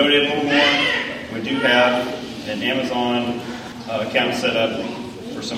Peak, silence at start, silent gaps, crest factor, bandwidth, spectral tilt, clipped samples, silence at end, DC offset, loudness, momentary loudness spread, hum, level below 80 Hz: -4 dBFS; 0 s; none; 18 dB; 16 kHz; -4 dB/octave; under 0.1%; 0 s; under 0.1%; -19 LUFS; 14 LU; none; -54 dBFS